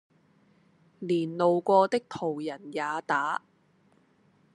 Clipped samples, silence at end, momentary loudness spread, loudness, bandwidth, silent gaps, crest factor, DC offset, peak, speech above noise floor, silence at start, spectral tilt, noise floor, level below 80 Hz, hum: under 0.1%; 1.15 s; 12 LU; -28 LUFS; 11 kHz; none; 22 dB; under 0.1%; -8 dBFS; 38 dB; 1 s; -6 dB/octave; -65 dBFS; -82 dBFS; none